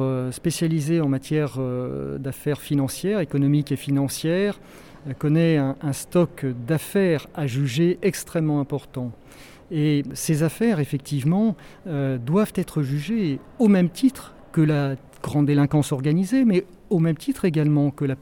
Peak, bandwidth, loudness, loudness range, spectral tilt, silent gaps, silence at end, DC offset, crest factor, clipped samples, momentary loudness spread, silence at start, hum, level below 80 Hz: -8 dBFS; 17.5 kHz; -23 LUFS; 3 LU; -7 dB/octave; none; 0.05 s; under 0.1%; 14 dB; under 0.1%; 9 LU; 0 s; none; -52 dBFS